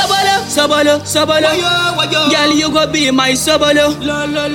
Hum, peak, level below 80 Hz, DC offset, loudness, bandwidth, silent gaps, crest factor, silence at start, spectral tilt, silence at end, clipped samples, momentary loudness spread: none; 0 dBFS; -42 dBFS; under 0.1%; -12 LUFS; 16.5 kHz; none; 12 dB; 0 s; -3 dB/octave; 0 s; under 0.1%; 3 LU